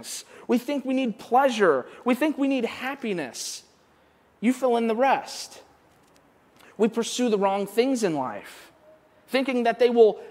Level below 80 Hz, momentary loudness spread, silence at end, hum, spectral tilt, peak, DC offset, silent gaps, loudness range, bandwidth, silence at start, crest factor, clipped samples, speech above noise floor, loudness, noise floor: -76 dBFS; 13 LU; 0 s; none; -4 dB/octave; -6 dBFS; under 0.1%; none; 3 LU; 16 kHz; 0 s; 20 dB; under 0.1%; 36 dB; -24 LUFS; -60 dBFS